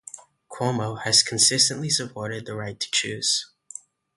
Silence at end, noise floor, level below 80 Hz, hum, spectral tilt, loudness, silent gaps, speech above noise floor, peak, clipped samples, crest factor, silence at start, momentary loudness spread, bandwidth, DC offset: 0.7 s; -45 dBFS; -64 dBFS; none; -2 dB/octave; -22 LUFS; none; 21 dB; -4 dBFS; under 0.1%; 22 dB; 0.15 s; 23 LU; 12 kHz; under 0.1%